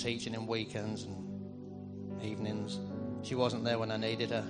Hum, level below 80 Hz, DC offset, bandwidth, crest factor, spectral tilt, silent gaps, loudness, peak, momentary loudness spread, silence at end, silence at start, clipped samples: none; -68 dBFS; under 0.1%; 10 kHz; 20 dB; -5.5 dB/octave; none; -37 LUFS; -18 dBFS; 11 LU; 0 s; 0 s; under 0.1%